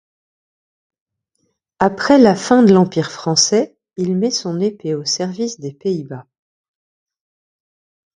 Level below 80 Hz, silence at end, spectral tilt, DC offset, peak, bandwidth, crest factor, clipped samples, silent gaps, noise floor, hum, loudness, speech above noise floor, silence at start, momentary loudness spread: -58 dBFS; 2 s; -4.5 dB/octave; under 0.1%; 0 dBFS; 10.5 kHz; 18 dB; under 0.1%; none; -69 dBFS; none; -16 LUFS; 54 dB; 1.8 s; 13 LU